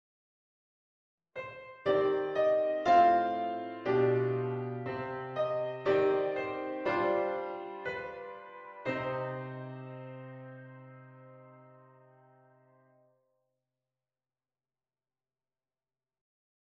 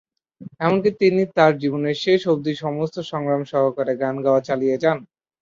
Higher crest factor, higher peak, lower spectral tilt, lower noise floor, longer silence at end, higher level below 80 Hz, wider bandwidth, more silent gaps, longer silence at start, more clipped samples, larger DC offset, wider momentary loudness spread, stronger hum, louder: about the same, 20 dB vs 18 dB; second, -14 dBFS vs -2 dBFS; about the same, -7.5 dB/octave vs -7 dB/octave; first, under -90 dBFS vs -42 dBFS; first, 4.95 s vs 0.4 s; second, -72 dBFS vs -64 dBFS; about the same, 7 kHz vs 7.4 kHz; neither; first, 1.35 s vs 0.4 s; neither; neither; first, 19 LU vs 8 LU; neither; second, -31 LUFS vs -20 LUFS